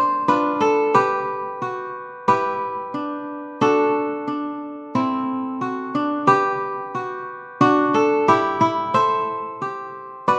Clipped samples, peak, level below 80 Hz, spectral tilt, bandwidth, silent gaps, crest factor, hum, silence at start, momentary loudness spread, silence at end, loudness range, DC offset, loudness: under 0.1%; -2 dBFS; -66 dBFS; -6 dB/octave; 8.8 kHz; none; 18 dB; none; 0 s; 12 LU; 0 s; 4 LU; under 0.1%; -21 LUFS